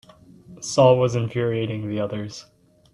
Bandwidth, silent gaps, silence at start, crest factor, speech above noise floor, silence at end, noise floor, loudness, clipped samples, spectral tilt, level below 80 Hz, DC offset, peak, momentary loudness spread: 11.5 kHz; none; 0.5 s; 20 dB; 27 dB; 0.5 s; -47 dBFS; -21 LUFS; under 0.1%; -6 dB/octave; -60 dBFS; under 0.1%; -2 dBFS; 18 LU